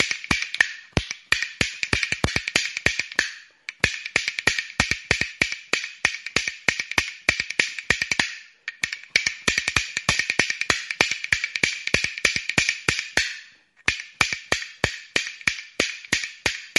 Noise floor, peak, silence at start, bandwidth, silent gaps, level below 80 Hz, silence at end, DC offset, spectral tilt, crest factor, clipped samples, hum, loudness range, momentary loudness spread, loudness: -49 dBFS; 0 dBFS; 0 s; 12 kHz; none; -46 dBFS; 0 s; under 0.1%; -1.5 dB/octave; 26 dB; under 0.1%; none; 2 LU; 6 LU; -23 LUFS